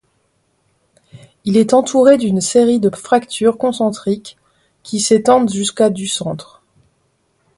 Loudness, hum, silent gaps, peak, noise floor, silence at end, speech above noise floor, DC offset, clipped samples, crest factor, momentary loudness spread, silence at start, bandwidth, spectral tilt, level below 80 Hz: -15 LUFS; none; none; 0 dBFS; -63 dBFS; 1.15 s; 49 dB; under 0.1%; under 0.1%; 16 dB; 11 LU; 1.15 s; 11.5 kHz; -4.5 dB/octave; -56 dBFS